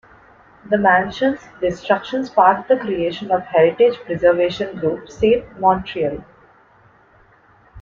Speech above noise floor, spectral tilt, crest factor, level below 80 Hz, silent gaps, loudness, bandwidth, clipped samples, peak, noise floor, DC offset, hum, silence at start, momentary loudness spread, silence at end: 35 dB; -6.5 dB/octave; 18 dB; -48 dBFS; none; -18 LUFS; 7.2 kHz; under 0.1%; -2 dBFS; -52 dBFS; under 0.1%; none; 0.65 s; 9 LU; 0 s